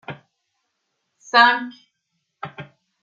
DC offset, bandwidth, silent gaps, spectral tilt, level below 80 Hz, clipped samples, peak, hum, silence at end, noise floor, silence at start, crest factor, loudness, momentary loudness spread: under 0.1%; 7.8 kHz; none; -3 dB/octave; -76 dBFS; under 0.1%; -2 dBFS; none; 0.4 s; -75 dBFS; 0.1 s; 22 dB; -16 LUFS; 24 LU